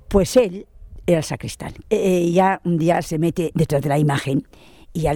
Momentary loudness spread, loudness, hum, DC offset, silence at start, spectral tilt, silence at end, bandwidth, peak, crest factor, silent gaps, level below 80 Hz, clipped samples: 12 LU; -20 LUFS; none; under 0.1%; 0.1 s; -6.5 dB/octave; 0 s; 18.5 kHz; -2 dBFS; 18 dB; none; -38 dBFS; under 0.1%